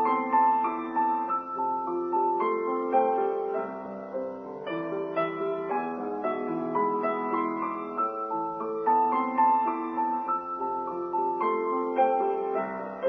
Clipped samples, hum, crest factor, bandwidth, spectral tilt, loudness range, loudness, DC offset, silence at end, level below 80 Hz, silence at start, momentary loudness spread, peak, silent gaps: under 0.1%; none; 16 dB; 5 kHz; -8.5 dB/octave; 4 LU; -28 LUFS; under 0.1%; 0 s; -74 dBFS; 0 s; 8 LU; -12 dBFS; none